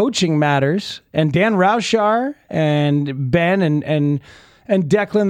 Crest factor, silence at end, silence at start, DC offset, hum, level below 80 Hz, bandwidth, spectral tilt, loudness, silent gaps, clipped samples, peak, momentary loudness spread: 14 dB; 0 s; 0 s; under 0.1%; none; -52 dBFS; 10 kHz; -6 dB/octave; -17 LUFS; none; under 0.1%; -2 dBFS; 5 LU